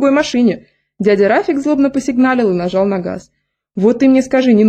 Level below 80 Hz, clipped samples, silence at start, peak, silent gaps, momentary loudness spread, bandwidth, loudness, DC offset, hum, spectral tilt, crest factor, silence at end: -50 dBFS; under 0.1%; 0 s; -2 dBFS; none; 10 LU; 9 kHz; -13 LUFS; under 0.1%; none; -6.5 dB/octave; 12 dB; 0 s